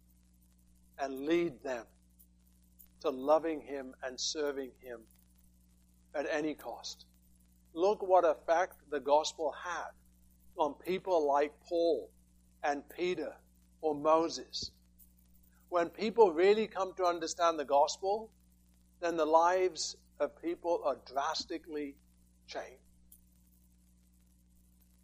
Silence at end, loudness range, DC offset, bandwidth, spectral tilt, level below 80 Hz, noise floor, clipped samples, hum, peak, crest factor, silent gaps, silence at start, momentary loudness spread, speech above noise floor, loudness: 2.3 s; 8 LU; under 0.1%; 15.5 kHz; -3.5 dB/octave; -66 dBFS; -66 dBFS; under 0.1%; 60 Hz at -65 dBFS; -12 dBFS; 22 dB; none; 1 s; 16 LU; 33 dB; -33 LUFS